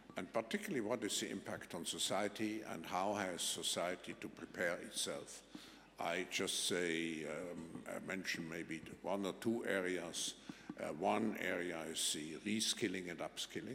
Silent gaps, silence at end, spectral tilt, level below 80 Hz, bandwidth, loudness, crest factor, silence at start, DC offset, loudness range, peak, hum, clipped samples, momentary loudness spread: none; 0 s; -2.5 dB/octave; -76 dBFS; 16.5 kHz; -41 LUFS; 20 dB; 0 s; under 0.1%; 2 LU; -22 dBFS; none; under 0.1%; 11 LU